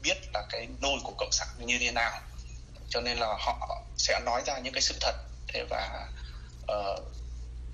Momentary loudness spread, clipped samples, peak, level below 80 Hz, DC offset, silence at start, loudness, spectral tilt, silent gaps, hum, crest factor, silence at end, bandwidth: 16 LU; under 0.1%; -10 dBFS; -44 dBFS; under 0.1%; 0 s; -31 LUFS; -2 dB/octave; none; none; 22 dB; 0 s; 11.5 kHz